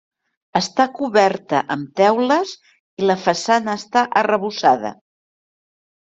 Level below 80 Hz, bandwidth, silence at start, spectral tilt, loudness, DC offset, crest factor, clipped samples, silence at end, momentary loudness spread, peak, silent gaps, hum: -64 dBFS; 8.2 kHz; 0.55 s; -4.5 dB/octave; -18 LUFS; under 0.1%; 18 dB; under 0.1%; 1.2 s; 6 LU; -2 dBFS; 2.80-2.97 s; none